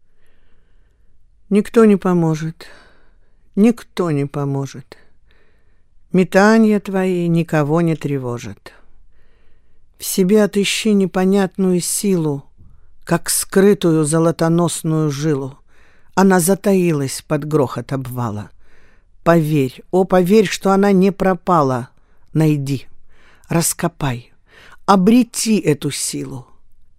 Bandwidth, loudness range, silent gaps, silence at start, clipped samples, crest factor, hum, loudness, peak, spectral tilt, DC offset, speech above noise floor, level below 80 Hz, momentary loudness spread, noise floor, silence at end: 16 kHz; 4 LU; none; 1.5 s; under 0.1%; 18 dB; none; -16 LUFS; 0 dBFS; -5.5 dB/octave; under 0.1%; 33 dB; -46 dBFS; 12 LU; -48 dBFS; 0.15 s